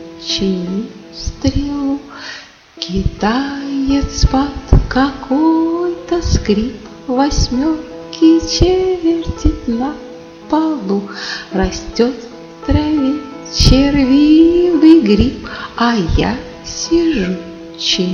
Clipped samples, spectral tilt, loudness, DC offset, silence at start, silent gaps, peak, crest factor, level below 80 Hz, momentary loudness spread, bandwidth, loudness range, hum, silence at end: under 0.1%; -5.5 dB/octave; -15 LUFS; under 0.1%; 0 s; none; 0 dBFS; 14 dB; -24 dBFS; 16 LU; 7.2 kHz; 7 LU; none; 0 s